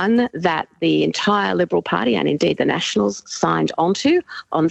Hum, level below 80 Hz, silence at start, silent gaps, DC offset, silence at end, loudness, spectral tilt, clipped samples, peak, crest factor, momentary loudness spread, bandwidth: none; -58 dBFS; 0 s; none; under 0.1%; 0 s; -19 LUFS; -5 dB/octave; under 0.1%; -4 dBFS; 14 dB; 3 LU; 8.4 kHz